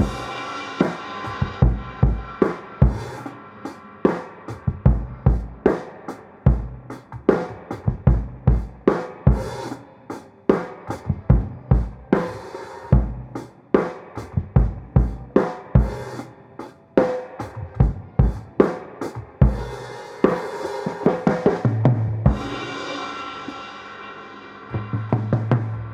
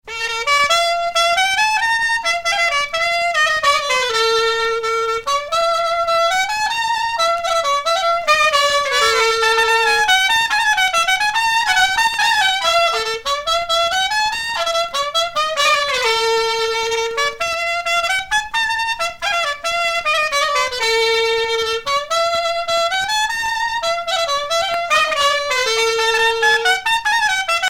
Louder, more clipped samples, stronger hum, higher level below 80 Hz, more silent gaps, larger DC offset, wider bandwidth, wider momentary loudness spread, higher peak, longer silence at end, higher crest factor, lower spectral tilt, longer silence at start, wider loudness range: second, -23 LUFS vs -16 LUFS; neither; neither; first, -28 dBFS vs -48 dBFS; neither; neither; second, 9 kHz vs 17.5 kHz; first, 15 LU vs 5 LU; about the same, -2 dBFS vs -2 dBFS; about the same, 0 s vs 0 s; about the same, 20 dB vs 16 dB; first, -8.5 dB/octave vs 1 dB/octave; about the same, 0 s vs 0.05 s; about the same, 2 LU vs 4 LU